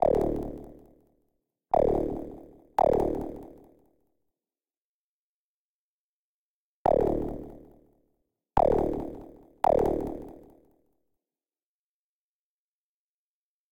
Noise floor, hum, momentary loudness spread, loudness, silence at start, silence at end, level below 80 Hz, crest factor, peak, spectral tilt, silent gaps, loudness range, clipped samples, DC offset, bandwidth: under -90 dBFS; none; 20 LU; -28 LUFS; 0 s; 3.35 s; -46 dBFS; 20 dB; -12 dBFS; -8.5 dB/octave; 4.77-6.85 s; 6 LU; under 0.1%; under 0.1%; 17 kHz